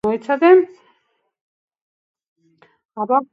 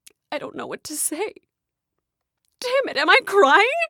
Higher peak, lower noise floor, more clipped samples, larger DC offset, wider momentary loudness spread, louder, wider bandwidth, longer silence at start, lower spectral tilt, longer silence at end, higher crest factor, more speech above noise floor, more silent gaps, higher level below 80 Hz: about the same, 0 dBFS vs 0 dBFS; second, -67 dBFS vs -83 dBFS; neither; neither; about the same, 17 LU vs 17 LU; first, -15 LUFS vs -18 LUFS; second, 5 kHz vs 18.5 kHz; second, 0.05 s vs 0.3 s; first, -7.5 dB/octave vs -0.5 dB/octave; about the same, 0.1 s vs 0 s; about the same, 20 dB vs 22 dB; second, 52 dB vs 63 dB; first, 1.41-1.68 s, 1.82-2.14 s, 2.28-2.36 s vs none; first, -64 dBFS vs -74 dBFS